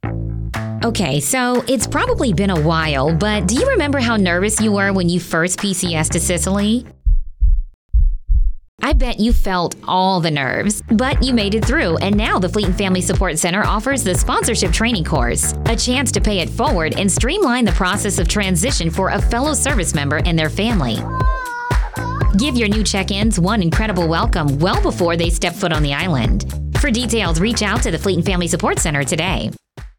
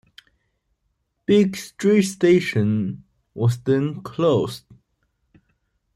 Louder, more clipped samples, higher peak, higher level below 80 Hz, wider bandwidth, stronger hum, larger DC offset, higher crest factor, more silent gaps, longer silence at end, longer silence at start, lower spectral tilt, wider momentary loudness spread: first, -17 LUFS vs -20 LUFS; neither; about the same, -6 dBFS vs -6 dBFS; first, -22 dBFS vs -60 dBFS; first, 19.5 kHz vs 14.5 kHz; neither; neither; second, 10 dB vs 18 dB; first, 7.74-7.89 s, 8.68-8.78 s vs none; second, 0.1 s vs 1.4 s; second, 0.05 s vs 1.3 s; second, -4.5 dB/octave vs -6.5 dB/octave; second, 5 LU vs 13 LU